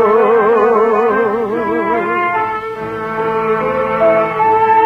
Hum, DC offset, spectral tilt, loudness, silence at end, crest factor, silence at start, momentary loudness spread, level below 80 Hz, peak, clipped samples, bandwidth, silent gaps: none; under 0.1%; -7 dB/octave; -14 LUFS; 0 s; 12 dB; 0 s; 8 LU; -48 dBFS; -2 dBFS; under 0.1%; 5.8 kHz; none